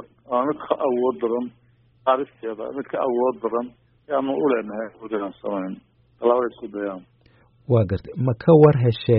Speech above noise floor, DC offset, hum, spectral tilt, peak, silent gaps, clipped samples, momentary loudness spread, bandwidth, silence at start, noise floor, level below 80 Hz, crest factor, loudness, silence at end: 36 dB; under 0.1%; none; -7.5 dB/octave; -2 dBFS; none; under 0.1%; 15 LU; 5.2 kHz; 0 s; -57 dBFS; -56 dBFS; 20 dB; -22 LUFS; 0 s